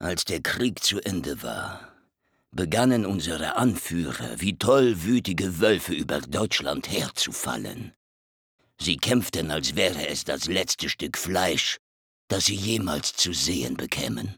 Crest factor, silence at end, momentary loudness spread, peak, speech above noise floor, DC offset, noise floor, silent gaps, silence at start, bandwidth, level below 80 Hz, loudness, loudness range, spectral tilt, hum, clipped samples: 22 dB; 0.05 s; 9 LU; -6 dBFS; 45 dB; under 0.1%; -71 dBFS; 7.96-8.59 s, 11.79-12.28 s; 0 s; over 20 kHz; -54 dBFS; -25 LUFS; 3 LU; -3.5 dB/octave; none; under 0.1%